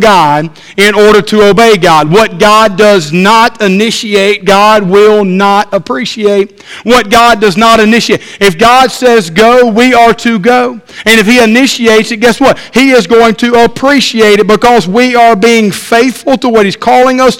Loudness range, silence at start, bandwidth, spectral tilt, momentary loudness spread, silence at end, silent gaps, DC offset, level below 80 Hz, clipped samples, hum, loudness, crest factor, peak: 2 LU; 0 s; 17 kHz; -4.5 dB/octave; 5 LU; 0 s; none; under 0.1%; -36 dBFS; 6%; none; -5 LUFS; 6 dB; 0 dBFS